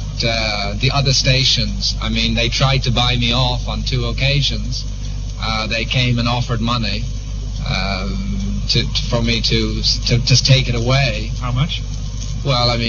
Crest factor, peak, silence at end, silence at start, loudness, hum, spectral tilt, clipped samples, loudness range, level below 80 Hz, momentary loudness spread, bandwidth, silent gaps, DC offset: 18 dB; 0 dBFS; 0 s; 0 s; -17 LUFS; none; -4.5 dB/octave; under 0.1%; 4 LU; -24 dBFS; 10 LU; 7.2 kHz; none; under 0.1%